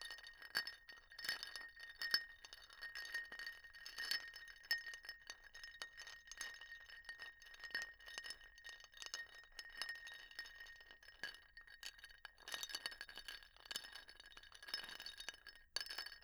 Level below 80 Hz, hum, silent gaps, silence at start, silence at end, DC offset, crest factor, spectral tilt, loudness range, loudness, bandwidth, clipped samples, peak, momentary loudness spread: -74 dBFS; none; none; 0 s; 0 s; under 0.1%; 32 dB; 1.5 dB/octave; 6 LU; -49 LUFS; over 20 kHz; under 0.1%; -20 dBFS; 14 LU